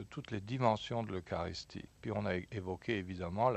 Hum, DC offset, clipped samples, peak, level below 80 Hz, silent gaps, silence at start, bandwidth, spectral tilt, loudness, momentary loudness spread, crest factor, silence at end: none; under 0.1%; under 0.1%; -14 dBFS; -62 dBFS; none; 0 s; 8.4 kHz; -6.5 dB/octave; -38 LUFS; 10 LU; 22 dB; 0 s